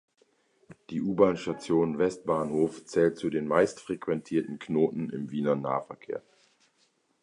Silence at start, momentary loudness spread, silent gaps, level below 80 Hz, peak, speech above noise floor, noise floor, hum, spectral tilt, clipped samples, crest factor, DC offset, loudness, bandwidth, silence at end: 0.7 s; 10 LU; none; -64 dBFS; -8 dBFS; 42 dB; -70 dBFS; none; -7 dB/octave; under 0.1%; 22 dB; under 0.1%; -29 LUFS; 11 kHz; 1.05 s